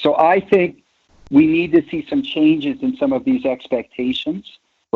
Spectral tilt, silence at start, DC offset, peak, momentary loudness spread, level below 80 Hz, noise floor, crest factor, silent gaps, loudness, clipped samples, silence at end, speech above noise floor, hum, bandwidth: -7.5 dB/octave; 0 s; under 0.1%; -2 dBFS; 9 LU; -54 dBFS; -50 dBFS; 14 dB; none; -18 LUFS; under 0.1%; 0.55 s; 33 dB; none; 5.8 kHz